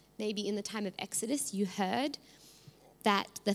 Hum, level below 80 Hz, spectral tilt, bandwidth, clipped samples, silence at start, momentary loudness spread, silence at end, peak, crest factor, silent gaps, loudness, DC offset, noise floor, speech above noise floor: none; -76 dBFS; -3.5 dB/octave; 16 kHz; under 0.1%; 0.2 s; 7 LU; 0 s; -12 dBFS; 24 dB; none; -34 LUFS; under 0.1%; -59 dBFS; 24 dB